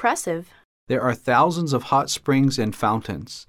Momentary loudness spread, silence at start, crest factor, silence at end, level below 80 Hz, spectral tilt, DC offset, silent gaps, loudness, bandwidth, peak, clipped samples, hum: 9 LU; 0 s; 16 dB; 0.05 s; -56 dBFS; -5 dB/octave; under 0.1%; 0.65-0.87 s; -22 LUFS; 16 kHz; -6 dBFS; under 0.1%; none